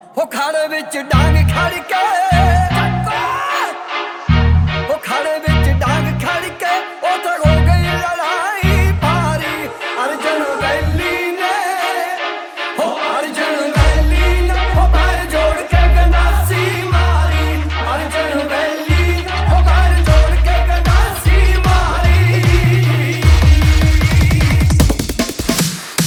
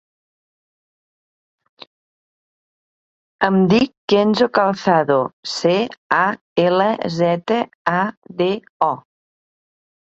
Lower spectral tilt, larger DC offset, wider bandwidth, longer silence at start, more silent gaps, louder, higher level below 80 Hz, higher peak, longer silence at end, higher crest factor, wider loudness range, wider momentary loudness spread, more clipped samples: about the same, -5.5 dB/octave vs -6 dB/octave; neither; first, 19 kHz vs 8 kHz; second, 0.15 s vs 3.4 s; second, none vs 3.97-4.08 s, 5.33-5.43 s, 5.98-6.10 s, 6.41-6.56 s, 7.75-7.85 s, 8.17-8.22 s, 8.69-8.80 s; first, -15 LUFS vs -18 LUFS; first, -18 dBFS vs -60 dBFS; about the same, 0 dBFS vs -2 dBFS; second, 0 s vs 1.1 s; about the same, 14 dB vs 18 dB; about the same, 4 LU vs 5 LU; about the same, 7 LU vs 6 LU; neither